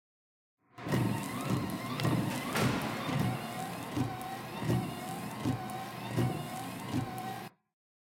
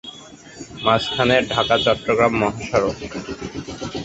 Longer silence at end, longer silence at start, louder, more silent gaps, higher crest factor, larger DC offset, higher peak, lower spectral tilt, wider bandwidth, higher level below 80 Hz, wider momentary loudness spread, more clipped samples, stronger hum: first, 0.7 s vs 0 s; first, 0.75 s vs 0.05 s; second, -35 LUFS vs -19 LUFS; neither; about the same, 22 dB vs 20 dB; neither; second, -14 dBFS vs -2 dBFS; about the same, -5.5 dB/octave vs -4.5 dB/octave; first, 17 kHz vs 8.2 kHz; second, -62 dBFS vs -44 dBFS; second, 9 LU vs 17 LU; neither; neither